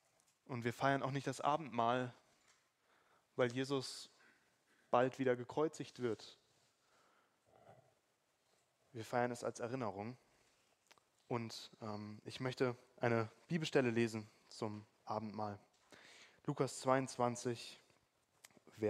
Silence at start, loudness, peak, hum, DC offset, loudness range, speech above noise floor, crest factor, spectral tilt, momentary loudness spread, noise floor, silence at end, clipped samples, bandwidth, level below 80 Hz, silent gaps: 0.5 s; -41 LUFS; -18 dBFS; none; under 0.1%; 7 LU; 41 dB; 24 dB; -5.5 dB/octave; 15 LU; -81 dBFS; 0 s; under 0.1%; 15.5 kHz; -84 dBFS; none